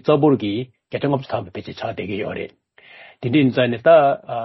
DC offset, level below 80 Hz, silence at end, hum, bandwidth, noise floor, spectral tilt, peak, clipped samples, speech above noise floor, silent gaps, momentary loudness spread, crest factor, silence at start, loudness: under 0.1%; -58 dBFS; 0 s; none; 6 kHz; -46 dBFS; -9 dB/octave; -2 dBFS; under 0.1%; 27 dB; none; 16 LU; 16 dB; 0.05 s; -19 LUFS